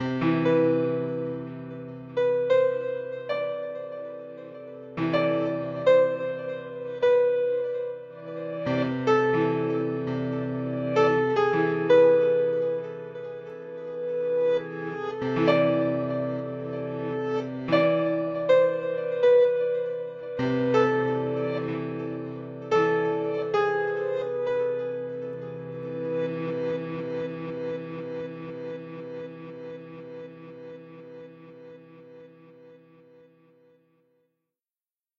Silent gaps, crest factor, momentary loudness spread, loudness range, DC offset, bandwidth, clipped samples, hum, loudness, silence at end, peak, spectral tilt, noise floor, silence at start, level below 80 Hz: none; 20 dB; 17 LU; 13 LU; under 0.1%; 7 kHz; under 0.1%; none; -26 LUFS; 2.4 s; -6 dBFS; -8 dB/octave; under -90 dBFS; 0 s; -68 dBFS